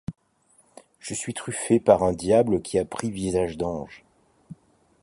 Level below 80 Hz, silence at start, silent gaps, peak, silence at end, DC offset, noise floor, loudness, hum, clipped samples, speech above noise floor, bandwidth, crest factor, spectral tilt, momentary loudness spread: -50 dBFS; 0.1 s; none; -4 dBFS; 0.5 s; under 0.1%; -63 dBFS; -24 LUFS; none; under 0.1%; 39 dB; 11.5 kHz; 22 dB; -5.5 dB/octave; 15 LU